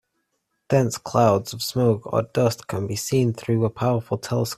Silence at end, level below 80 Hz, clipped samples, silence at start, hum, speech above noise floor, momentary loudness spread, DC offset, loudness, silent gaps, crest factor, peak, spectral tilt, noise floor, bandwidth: 0.05 s; -56 dBFS; under 0.1%; 0.7 s; none; 53 dB; 7 LU; under 0.1%; -23 LUFS; none; 18 dB; -4 dBFS; -6 dB/octave; -74 dBFS; 15 kHz